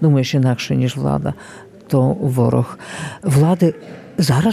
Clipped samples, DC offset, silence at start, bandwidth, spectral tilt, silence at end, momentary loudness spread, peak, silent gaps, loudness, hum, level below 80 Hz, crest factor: under 0.1%; under 0.1%; 0 s; 14.5 kHz; -7 dB/octave; 0 s; 14 LU; -2 dBFS; none; -17 LUFS; none; -46 dBFS; 14 dB